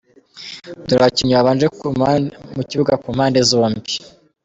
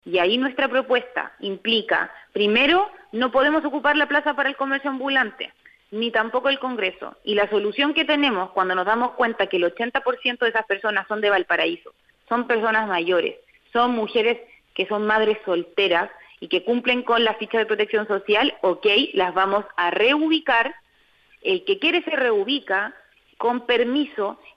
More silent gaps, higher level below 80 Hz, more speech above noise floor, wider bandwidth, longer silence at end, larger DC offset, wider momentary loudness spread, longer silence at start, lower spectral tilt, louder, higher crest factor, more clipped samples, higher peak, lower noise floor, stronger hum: neither; first, -50 dBFS vs -62 dBFS; second, 22 dB vs 37 dB; first, 8.4 kHz vs 6.6 kHz; first, 0.35 s vs 0.2 s; neither; first, 17 LU vs 8 LU; first, 0.35 s vs 0.05 s; about the same, -5 dB/octave vs -5.5 dB/octave; first, -16 LUFS vs -21 LUFS; about the same, 16 dB vs 14 dB; neither; first, -2 dBFS vs -8 dBFS; second, -38 dBFS vs -59 dBFS; neither